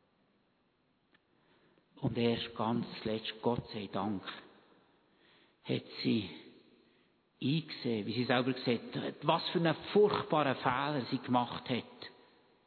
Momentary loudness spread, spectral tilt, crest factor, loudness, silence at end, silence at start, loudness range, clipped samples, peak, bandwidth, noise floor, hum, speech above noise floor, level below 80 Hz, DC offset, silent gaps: 10 LU; -4.5 dB/octave; 22 dB; -34 LUFS; 0.55 s; 1.95 s; 8 LU; under 0.1%; -12 dBFS; 4.6 kHz; -75 dBFS; none; 41 dB; -70 dBFS; under 0.1%; none